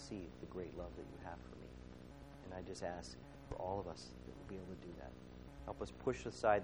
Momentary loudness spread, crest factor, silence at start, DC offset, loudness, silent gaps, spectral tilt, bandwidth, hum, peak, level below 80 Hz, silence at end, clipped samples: 13 LU; 24 dB; 0 s; under 0.1%; -48 LUFS; none; -5.5 dB/octave; over 20 kHz; none; -20 dBFS; -60 dBFS; 0 s; under 0.1%